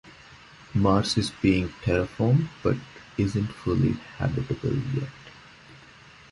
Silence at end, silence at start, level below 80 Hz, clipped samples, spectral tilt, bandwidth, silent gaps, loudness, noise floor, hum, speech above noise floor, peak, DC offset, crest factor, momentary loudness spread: 0.55 s; 0.05 s; -44 dBFS; under 0.1%; -6.5 dB/octave; 11.5 kHz; none; -26 LUFS; -50 dBFS; none; 26 dB; -6 dBFS; under 0.1%; 20 dB; 9 LU